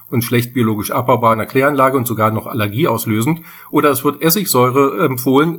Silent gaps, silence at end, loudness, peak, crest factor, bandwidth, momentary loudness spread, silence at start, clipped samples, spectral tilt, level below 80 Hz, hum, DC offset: none; 0 s; -15 LUFS; 0 dBFS; 14 dB; 19.5 kHz; 5 LU; 0.1 s; under 0.1%; -5.5 dB/octave; -56 dBFS; none; under 0.1%